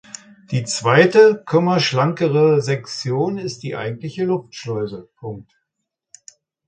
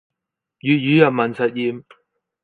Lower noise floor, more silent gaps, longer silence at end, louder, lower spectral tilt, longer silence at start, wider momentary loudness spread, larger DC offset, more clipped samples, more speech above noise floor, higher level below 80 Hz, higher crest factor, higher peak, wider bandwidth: about the same, -79 dBFS vs -82 dBFS; neither; first, 1.25 s vs 0.65 s; about the same, -18 LUFS vs -18 LUFS; second, -5.5 dB/octave vs -8.5 dB/octave; second, 0.5 s vs 0.65 s; first, 20 LU vs 12 LU; neither; neither; second, 61 dB vs 65 dB; first, -60 dBFS vs -68 dBFS; about the same, 18 dB vs 20 dB; about the same, 0 dBFS vs 0 dBFS; first, 9.4 kHz vs 4.6 kHz